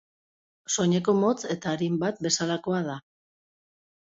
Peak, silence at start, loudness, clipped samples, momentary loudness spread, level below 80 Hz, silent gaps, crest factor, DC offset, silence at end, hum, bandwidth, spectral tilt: -10 dBFS; 0.7 s; -26 LUFS; under 0.1%; 9 LU; -68 dBFS; none; 18 dB; under 0.1%; 1.15 s; none; 8 kHz; -4.5 dB/octave